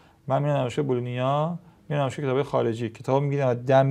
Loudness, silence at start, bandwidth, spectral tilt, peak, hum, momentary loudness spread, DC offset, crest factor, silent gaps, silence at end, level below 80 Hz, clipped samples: -25 LUFS; 0.25 s; 10 kHz; -7.5 dB/octave; -6 dBFS; none; 7 LU; under 0.1%; 18 dB; none; 0 s; -64 dBFS; under 0.1%